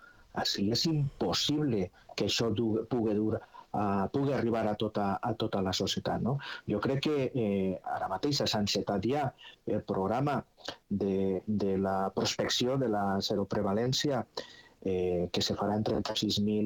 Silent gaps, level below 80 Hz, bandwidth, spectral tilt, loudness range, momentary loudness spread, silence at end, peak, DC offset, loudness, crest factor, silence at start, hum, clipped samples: none; -60 dBFS; 19 kHz; -5 dB/octave; 2 LU; 7 LU; 0 s; -18 dBFS; under 0.1%; -31 LUFS; 14 dB; 0 s; none; under 0.1%